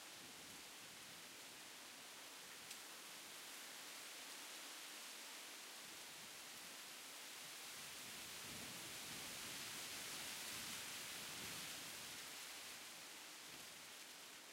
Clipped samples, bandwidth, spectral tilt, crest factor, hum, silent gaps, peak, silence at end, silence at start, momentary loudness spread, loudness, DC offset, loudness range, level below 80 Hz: under 0.1%; 16 kHz; -0.5 dB/octave; 18 dB; none; none; -36 dBFS; 0 s; 0 s; 7 LU; -51 LUFS; under 0.1%; 5 LU; -84 dBFS